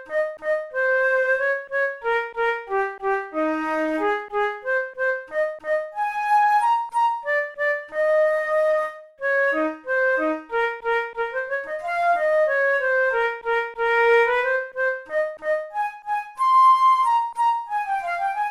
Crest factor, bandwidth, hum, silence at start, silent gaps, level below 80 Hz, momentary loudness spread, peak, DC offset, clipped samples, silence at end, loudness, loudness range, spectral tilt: 14 dB; 13.5 kHz; none; 0 s; none; -60 dBFS; 8 LU; -8 dBFS; under 0.1%; under 0.1%; 0 s; -22 LUFS; 4 LU; -3 dB/octave